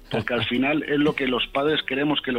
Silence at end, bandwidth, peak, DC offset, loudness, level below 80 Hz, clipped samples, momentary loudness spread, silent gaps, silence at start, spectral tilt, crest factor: 0 s; 15 kHz; -8 dBFS; under 0.1%; -23 LUFS; -50 dBFS; under 0.1%; 2 LU; none; 0 s; -6.5 dB/octave; 14 dB